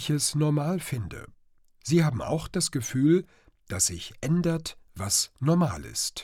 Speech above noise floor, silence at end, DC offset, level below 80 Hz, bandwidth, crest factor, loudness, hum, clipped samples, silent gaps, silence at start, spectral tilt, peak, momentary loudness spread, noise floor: 33 dB; 0 s; under 0.1%; -54 dBFS; 16.5 kHz; 16 dB; -26 LUFS; none; under 0.1%; none; 0 s; -4.5 dB/octave; -10 dBFS; 12 LU; -60 dBFS